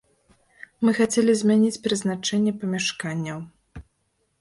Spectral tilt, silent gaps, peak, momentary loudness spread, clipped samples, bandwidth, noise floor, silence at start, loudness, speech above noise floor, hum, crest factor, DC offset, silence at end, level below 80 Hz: -4.5 dB/octave; none; -8 dBFS; 11 LU; under 0.1%; 11.5 kHz; -71 dBFS; 0.8 s; -23 LUFS; 49 dB; none; 16 dB; under 0.1%; 0.6 s; -58 dBFS